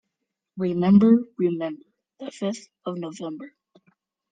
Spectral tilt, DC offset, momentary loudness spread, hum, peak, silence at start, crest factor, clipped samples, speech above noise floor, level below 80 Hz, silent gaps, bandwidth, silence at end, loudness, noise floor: -8 dB/octave; under 0.1%; 23 LU; none; -6 dBFS; 0.55 s; 18 dB; under 0.1%; 60 dB; -62 dBFS; none; 9 kHz; 0.85 s; -23 LUFS; -82 dBFS